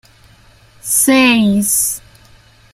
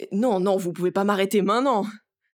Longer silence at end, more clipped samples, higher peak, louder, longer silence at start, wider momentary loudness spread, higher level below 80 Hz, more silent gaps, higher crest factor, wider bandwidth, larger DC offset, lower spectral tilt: first, 0.75 s vs 0.35 s; neither; first, 0 dBFS vs -6 dBFS; first, -12 LUFS vs -23 LUFS; first, 0.85 s vs 0 s; first, 14 LU vs 4 LU; first, -48 dBFS vs -76 dBFS; neither; about the same, 16 dB vs 16 dB; second, 16 kHz vs over 20 kHz; neither; second, -3 dB/octave vs -6 dB/octave